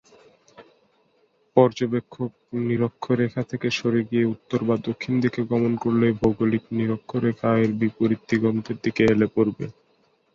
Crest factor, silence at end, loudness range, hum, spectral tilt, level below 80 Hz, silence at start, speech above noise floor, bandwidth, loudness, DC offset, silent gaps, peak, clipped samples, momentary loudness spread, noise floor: 22 dB; 0.65 s; 2 LU; none; -7.5 dB/octave; -54 dBFS; 0.6 s; 42 dB; 7.2 kHz; -23 LUFS; under 0.1%; none; -2 dBFS; under 0.1%; 7 LU; -64 dBFS